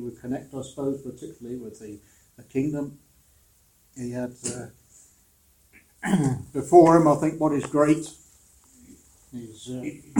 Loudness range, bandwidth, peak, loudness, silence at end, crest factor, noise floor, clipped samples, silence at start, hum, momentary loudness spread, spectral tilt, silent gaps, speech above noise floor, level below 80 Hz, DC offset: 14 LU; 17 kHz; -2 dBFS; -23 LUFS; 0 s; 24 dB; -61 dBFS; under 0.1%; 0 s; none; 23 LU; -7 dB/octave; none; 37 dB; -58 dBFS; under 0.1%